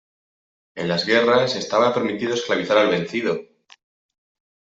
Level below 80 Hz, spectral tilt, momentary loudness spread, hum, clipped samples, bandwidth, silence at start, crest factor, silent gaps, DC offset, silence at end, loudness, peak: -64 dBFS; -4.5 dB/octave; 9 LU; none; under 0.1%; 8 kHz; 0.75 s; 18 dB; none; under 0.1%; 1.25 s; -20 LUFS; -4 dBFS